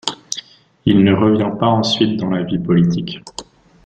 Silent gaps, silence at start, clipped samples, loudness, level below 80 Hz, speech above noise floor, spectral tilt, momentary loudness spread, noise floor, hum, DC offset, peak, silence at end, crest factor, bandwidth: none; 0.05 s; under 0.1%; -16 LUFS; -48 dBFS; 22 dB; -6 dB/octave; 15 LU; -37 dBFS; none; under 0.1%; 0 dBFS; 0.45 s; 16 dB; 9.2 kHz